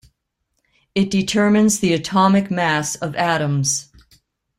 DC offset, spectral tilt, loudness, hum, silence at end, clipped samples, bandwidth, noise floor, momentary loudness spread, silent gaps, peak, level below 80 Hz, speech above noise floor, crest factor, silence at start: under 0.1%; -4.5 dB/octave; -18 LUFS; none; 0.75 s; under 0.1%; 15.5 kHz; -73 dBFS; 7 LU; none; -4 dBFS; -54 dBFS; 56 dB; 16 dB; 0.95 s